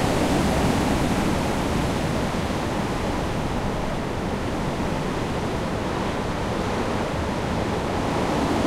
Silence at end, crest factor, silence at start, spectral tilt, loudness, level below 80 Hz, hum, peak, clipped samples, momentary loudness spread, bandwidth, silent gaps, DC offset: 0 s; 14 dB; 0 s; -5.5 dB/octave; -25 LUFS; -34 dBFS; none; -10 dBFS; under 0.1%; 5 LU; 16 kHz; none; under 0.1%